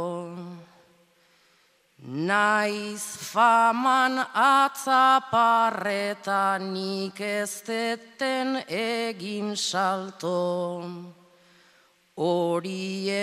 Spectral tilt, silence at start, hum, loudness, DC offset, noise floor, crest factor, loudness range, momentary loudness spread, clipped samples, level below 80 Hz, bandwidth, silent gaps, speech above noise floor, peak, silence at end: -3.5 dB/octave; 0 s; none; -25 LUFS; under 0.1%; -64 dBFS; 18 dB; 8 LU; 13 LU; under 0.1%; -80 dBFS; 15.5 kHz; none; 39 dB; -8 dBFS; 0 s